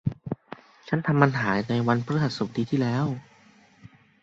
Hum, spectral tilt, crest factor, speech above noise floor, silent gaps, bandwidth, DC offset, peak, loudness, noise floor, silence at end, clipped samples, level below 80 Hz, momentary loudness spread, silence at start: none; -7.5 dB/octave; 24 dB; 32 dB; none; 7.8 kHz; under 0.1%; -4 dBFS; -25 LUFS; -56 dBFS; 0.35 s; under 0.1%; -58 dBFS; 15 LU; 0.05 s